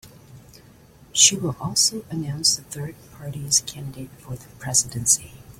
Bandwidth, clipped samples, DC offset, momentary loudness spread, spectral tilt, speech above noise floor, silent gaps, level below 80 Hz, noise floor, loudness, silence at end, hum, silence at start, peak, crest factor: 16.5 kHz; under 0.1%; under 0.1%; 21 LU; -1.5 dB/octave; 26 dB; none; -54 dBFS; -50 dBFS; -19 LUFS; 0.1 s; none; 0.05 s; 0 dBFS; 24 dB